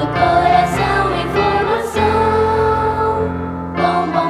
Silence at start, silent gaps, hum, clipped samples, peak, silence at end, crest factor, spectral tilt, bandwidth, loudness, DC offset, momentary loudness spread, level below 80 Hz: 0 s; none; none; under 0.1%; -2 dBFS; 0 s; 12 dB; -6 dB/octave; 14.5 kHz; -15 LUFS; under 0.1%; 5 LU; -34 dBFS